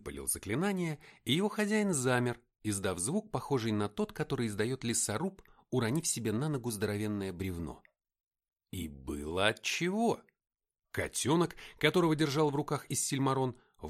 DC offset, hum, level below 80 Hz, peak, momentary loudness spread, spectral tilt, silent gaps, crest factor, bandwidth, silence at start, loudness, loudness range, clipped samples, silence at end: under 0.1%; none; -58 dBFS; -12 dBFS; 10 LU; -4.5 dB/octave; 8.27-8.31 s; 22 dB; 16 kHz; 0 s; -33 LUFS; 4 LU; under 0.1%; 0 s